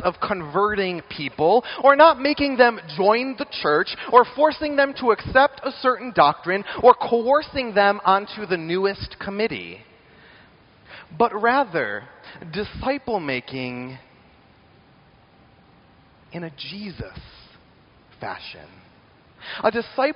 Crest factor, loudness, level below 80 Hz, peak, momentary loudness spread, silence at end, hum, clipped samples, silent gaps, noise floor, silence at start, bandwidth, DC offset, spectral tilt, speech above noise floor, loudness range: 22 dB; -20 LUFS; -52 dBFS; 0 dBFS; 18 LU; 0 s; none; under 0.1%; none; -54 dBFS; 0 s; 5.6 kHz; under 0.1%; -2.5 dB/octave; 33 dB; 19 LU